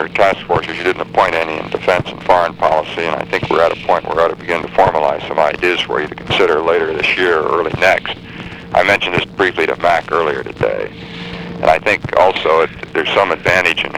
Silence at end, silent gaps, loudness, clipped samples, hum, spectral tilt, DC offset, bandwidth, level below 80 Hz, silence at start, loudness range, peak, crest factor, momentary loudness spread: 0 s; none; -14 LUFS; under 0.1%; none; -5 dB/octave; 0.1%; 16 kHz; -42 dBFS; 0 s; 1 LU; 0 dBFS; 14 dB; 7 LU